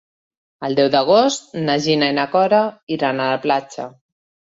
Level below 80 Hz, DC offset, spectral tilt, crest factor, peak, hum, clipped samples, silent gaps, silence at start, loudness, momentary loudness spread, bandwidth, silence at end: -62 dBFS; under 0.1%; -4.5 dB/octave; 16 dB; -2 dBFS; none; under 0.1%; 2.83-2.87 s; 0.6 s; -17 LUFS; 12 LU; 8 kHz; 0.6 s